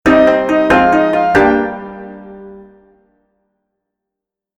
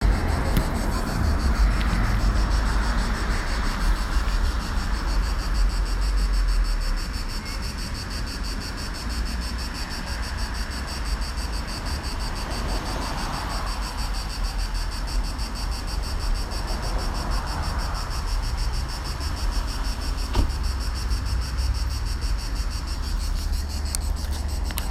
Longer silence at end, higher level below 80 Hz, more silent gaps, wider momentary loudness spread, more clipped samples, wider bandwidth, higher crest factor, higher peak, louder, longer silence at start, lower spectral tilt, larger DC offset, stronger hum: first, 2 s vs 0 s; second, -42 dBFS vs -26 dBFS; neither; first, 22 LU vs 6 LU; neither; second, 11.5 kHz vs 14.5 kHz; second, 14 dB vs 24 dB; about the same, 0 dBFS vs 0 dBFS; first, -11 LUFS vs -28 LUFS; about the same, 0.05 s vs 0 s; first, -6.5 dB/octave vs -4.5 dB/octave; neither; neither